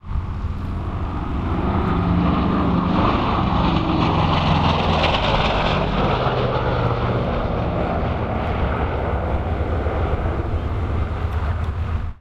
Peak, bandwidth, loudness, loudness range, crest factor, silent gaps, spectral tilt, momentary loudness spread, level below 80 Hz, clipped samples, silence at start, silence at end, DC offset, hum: -4 dBFS; 7.6 kHz; -21 LUFS; 5 LU; 16 dB; none; -7.5 dB/octave; 8 LU; -26 dBFS; under 0.1%; 0.05 s; 0.05 s; under 0.1%; none